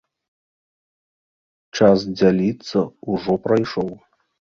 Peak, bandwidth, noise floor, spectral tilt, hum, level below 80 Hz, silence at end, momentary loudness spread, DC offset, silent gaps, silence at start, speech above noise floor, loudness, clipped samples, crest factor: -2 dBFS; 7.2 kHz; under -90 dBFS; -7 dB/octave; none; -54 dBFS; 0.55 s; 10 LU; under 0.1%; none; 1.75 s; over 71 dB; -19 LUFS; under 0.1%; 20 dB